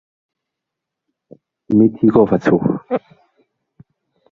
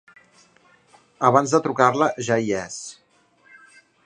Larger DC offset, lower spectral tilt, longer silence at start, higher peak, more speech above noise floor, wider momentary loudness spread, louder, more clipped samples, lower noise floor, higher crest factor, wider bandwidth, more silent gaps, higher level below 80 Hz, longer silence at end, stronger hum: neither; first, -9.5 dB/octave vs -5 dB/octave; first, 1.7 s vs 1.2 s; about the same, -2 dBFS vs 0 dBFS; first, 67 dB vs 38 dB; second, 11 LU vs 15 LU; first, -15 LUFS vs -20 LUFS; neither; first, -82 dBFS vs -58 dBFS; about the same, 18 dB vs 22 dB; second, 6.8 kHz vs 10.5 kHz; neither; first, -54 dBFS vs -64 dBFS; first, 1.35 s vs 1.15 s; neither